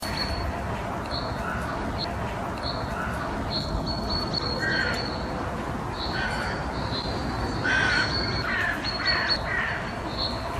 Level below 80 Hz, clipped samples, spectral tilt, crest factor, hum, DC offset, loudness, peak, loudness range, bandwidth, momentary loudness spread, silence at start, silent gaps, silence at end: -38 dBFS; under 0.1%; -4.5 dB/octave; 16 dB; none; under 0.1%; -27 LUFS; -12 dBFS; 5 LU; 14.5 kHz; 7 LU; 0 s; none; 0 s